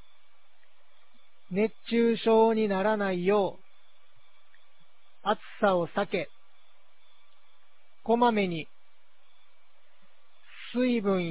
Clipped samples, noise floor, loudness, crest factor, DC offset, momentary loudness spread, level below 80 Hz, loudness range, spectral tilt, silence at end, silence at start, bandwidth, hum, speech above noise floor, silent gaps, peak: under 0.1%; -68 dBFS; -27 LUFS; 18 dB; 0.8%; 13 LU; -70 dBFS; 6 LU; -10 dB/octave; 0 s; 1.5 s; 4 kHz; none; 42 dB; none; -12 dBFS